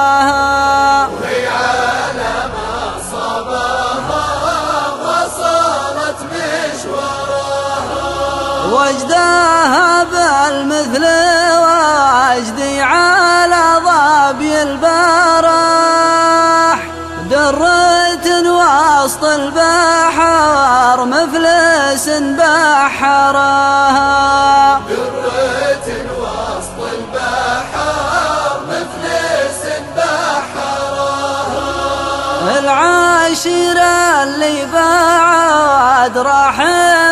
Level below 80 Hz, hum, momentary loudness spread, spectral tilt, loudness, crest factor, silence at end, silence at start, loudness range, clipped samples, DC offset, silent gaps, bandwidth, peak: -40 dBFS; none; 9 LU; -3 dB/octave; -12 LUFS; 12 dB; 0 s; 0 s; 7 LU; under 0.1%; under 0.1%; none; 13 kHz; 0 dBFS